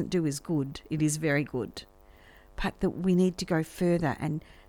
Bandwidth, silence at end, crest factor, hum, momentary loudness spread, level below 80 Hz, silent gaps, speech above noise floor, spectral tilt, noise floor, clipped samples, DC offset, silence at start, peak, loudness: 18 kHz; 0.3 s; 16 dB; none; 9 LU; -48 dBFS; none; 26 dB; -6 dB/octave; -55 dBFS; under 0.1%; under 0.1%; 0 s; -14 dBFS; -29 LUFS